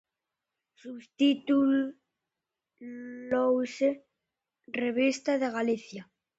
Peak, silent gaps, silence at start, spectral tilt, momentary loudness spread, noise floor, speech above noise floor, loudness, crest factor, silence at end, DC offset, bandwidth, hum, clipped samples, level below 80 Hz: -14 dBFS; none; 0.85 s; -4.5 dB/octave; 20 LU; -89 dBFS; 60 dB; -28 LUFS; 16 dB; 0.35 s; under 0.1%; 8 kHz; none; under 0.1%; -74 dBFS